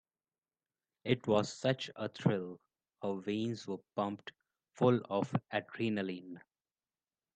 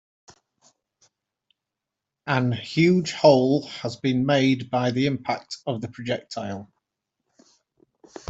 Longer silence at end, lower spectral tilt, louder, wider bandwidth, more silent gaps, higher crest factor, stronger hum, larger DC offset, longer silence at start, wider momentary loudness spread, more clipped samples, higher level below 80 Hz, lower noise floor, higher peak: second, 0.95 s vs 1.65 s; about the same, -6.5 dB/octave vs -6.5 dB/octave; second, -36 LUFS vs -23 LUFS; first, 9.2 kHz vs 8 kHz; neither; about the same, 22 dB vs 22 dB; neither; neither; second, 1.05 s vs 2.25 s; about the same, 16 LU vs 15 LU; neither; second, -76 dBFS vs -64 dBFS; first, under -90 dBFS vs -86 dBFS; second, -14 dBFS vs -4 dBFS